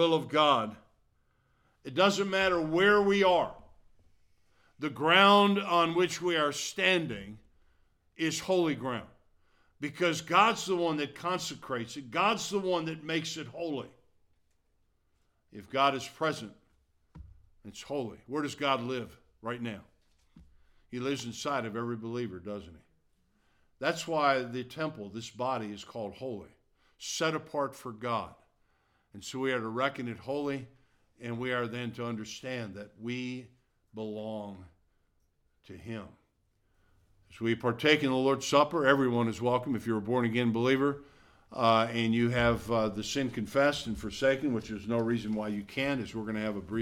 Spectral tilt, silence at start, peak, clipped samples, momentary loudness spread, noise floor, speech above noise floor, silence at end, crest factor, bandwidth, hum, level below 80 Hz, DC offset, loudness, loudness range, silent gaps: -4.5 dB/octave; 0 s; -8 dBFS; under 0.1%; 16 LU; -73 dBFS; 43 dB; 0 s; 24 dB; 17 kHz; none; -60 dBFS; under 0.1%; -30 LUFS; 11 LU; none